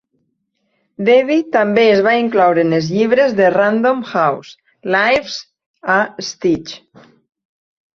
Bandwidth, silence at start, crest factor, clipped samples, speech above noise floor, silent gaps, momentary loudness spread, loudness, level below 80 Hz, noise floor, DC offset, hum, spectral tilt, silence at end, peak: 7.4 kHz; 1 s; 14 dB; under 0.1%; 54 dB; 5.66-5.74 s; 15 LU; -14 LUFS; -56 dBFS; -68 dBFS; under 0.1%; none; -5.5 dB/octave; 1.2 s; -2 dBFS